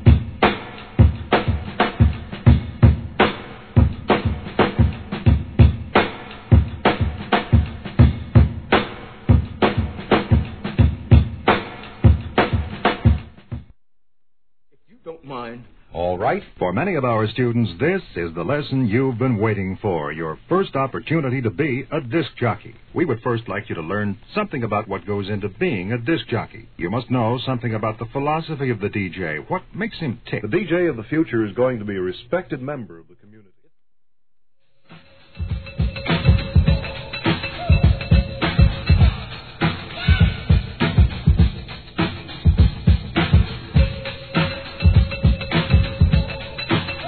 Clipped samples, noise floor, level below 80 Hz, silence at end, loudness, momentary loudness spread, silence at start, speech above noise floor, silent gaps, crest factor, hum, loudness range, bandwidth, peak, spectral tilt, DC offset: under 0.1%; -75 dBFS; -26 dBFS; 0 s; -20 LUFS; 11 LU; 0 s; 52 dB; none; 20 dB; none; 6 LU; 4.5 kHz; 0 dBFS; -10.5 dB/octave; 0.3%